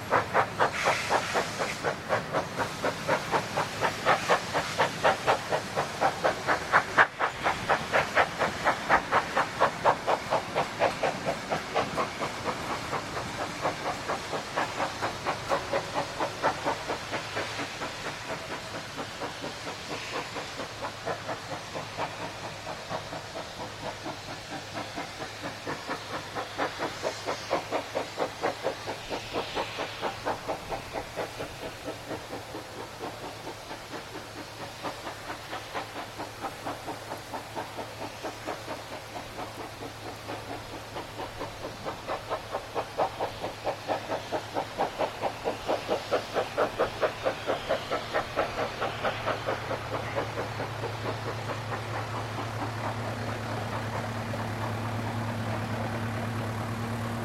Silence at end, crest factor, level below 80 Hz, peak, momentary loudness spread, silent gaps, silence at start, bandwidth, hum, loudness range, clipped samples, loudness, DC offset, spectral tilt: 0 s; 26 dB; -54 dBFS; -6 dBFS; 12 LU; none; 0 s; 16 kHz; none; 11 LU; under 0.1%; -31 LUFS; under 0.1%; -4 dB/octave